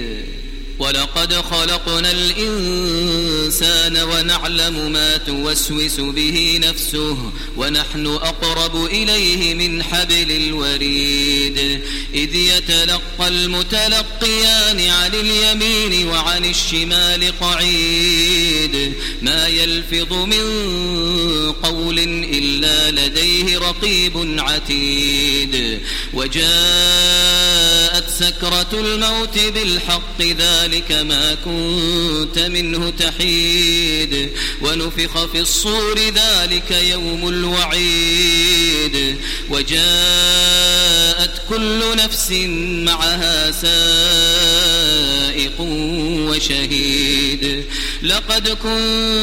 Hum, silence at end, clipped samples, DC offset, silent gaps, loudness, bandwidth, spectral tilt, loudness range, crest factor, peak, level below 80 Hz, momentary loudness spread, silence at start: none; 0 s; under 0.1%; under 0.1%; none; -14 LUFS; 16.5 kHz; -2 dB/octave; 4 LU; 16 dB; 0 dBFS; -26 dBFS; 8 LU; 0 s